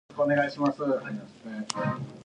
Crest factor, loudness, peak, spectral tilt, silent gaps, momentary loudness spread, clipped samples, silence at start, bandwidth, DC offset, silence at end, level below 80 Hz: 22 dB; -29 LUFS; -8 dBFS; -5.5 dB/octave; none; 14 LU; under 0.1%; 0.1 s; 10.5 kHz; under 0.1%; 0 s; -68 dBFS